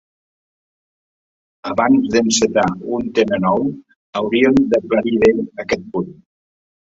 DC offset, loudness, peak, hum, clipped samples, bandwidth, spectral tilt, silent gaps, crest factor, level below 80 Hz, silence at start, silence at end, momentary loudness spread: under 0.1%; -17 LUFS; -2 dBFS; none; under 0.1%; 8 kHz; -4.5 dB/octave; 3.96-4.13 s; 16 dB; -50 dBFS; 1.65 s; 0.8 s; 12 LU